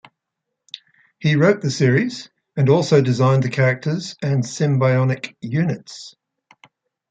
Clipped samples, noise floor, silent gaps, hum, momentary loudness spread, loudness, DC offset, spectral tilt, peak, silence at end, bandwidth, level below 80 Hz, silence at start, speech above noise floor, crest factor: under 0.1%; -80 dBFS; none; none; 21 LU; -18 LUFS; under 0.1%; -6.5 dB/octave; -2 dBFS; 1 s; 8.8 kHz; -62 dBFS; 1.2 s; 62 dB; 16 dB